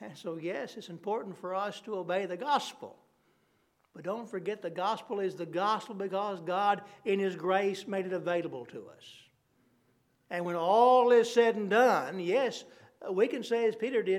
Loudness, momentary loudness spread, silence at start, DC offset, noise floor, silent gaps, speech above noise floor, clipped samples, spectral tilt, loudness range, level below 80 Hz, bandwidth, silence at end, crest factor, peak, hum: -30 LUFS; 17 LU; 0 s; under 0.1%; -72 dBFS; none; 42 dB; under 0.1%; -5 dB/octave; 9 LU; -88 dBFS; 13.5 kHz; 0 s; 20 dB; -12 dBFS; none